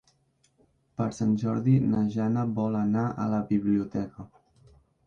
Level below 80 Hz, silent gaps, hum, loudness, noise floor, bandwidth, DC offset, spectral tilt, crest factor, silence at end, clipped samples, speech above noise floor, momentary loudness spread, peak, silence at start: -58 dBFS; none; none; -27 LUFS; -68 dBFS; 7.4 kHz; under 0.1%; -9 dB/octave; 16 dB; 0.8 s; under 0.1%; 42 dB; 10 LU; -12 dBFS; 1 s